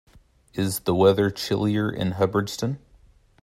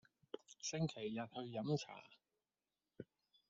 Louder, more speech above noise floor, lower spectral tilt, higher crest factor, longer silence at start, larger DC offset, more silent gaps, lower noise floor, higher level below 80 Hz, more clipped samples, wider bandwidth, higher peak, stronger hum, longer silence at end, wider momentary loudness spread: first, -23 LUFS vs -45 LUFS; second, 33 dB vs over 46 dB; about the same, -6 dB/octave vs -5.5 dB/octave; about the same, 20 dB vs 20 dB; first, 0.55 s vs 0.35 s; neither; neither; second, -55 dBFS vs under -90 dBFS; first, -54 dBFS vs -86 dBFS; neither; first, 16 kHz vs 8 kHz; first, -6 dBFS vs -28 dBFS; neither; first, 0.65 s vs 0.45 s; second, 11 LU vs 17 LU